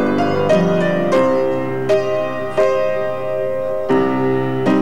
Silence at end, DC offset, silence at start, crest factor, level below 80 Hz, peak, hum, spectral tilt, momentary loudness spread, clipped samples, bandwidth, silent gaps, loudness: 0 s; 4%; 0 s; 12 dB; -54 dBFS; -4 dBFS; none; -7 dB/octave; 6 LU; under 0.1%; 15 kHz; none; -17 LUFS